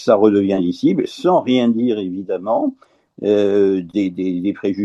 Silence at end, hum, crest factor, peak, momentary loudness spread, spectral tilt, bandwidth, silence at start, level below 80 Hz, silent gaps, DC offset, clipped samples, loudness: 0 s; none; 16 dB; 0 dBFS; 8 LU; -7.5 dB/octave; 8 kHz; 0 s; -62 dBFS; none; under 0.1%; under 0.1%; -17 LUFS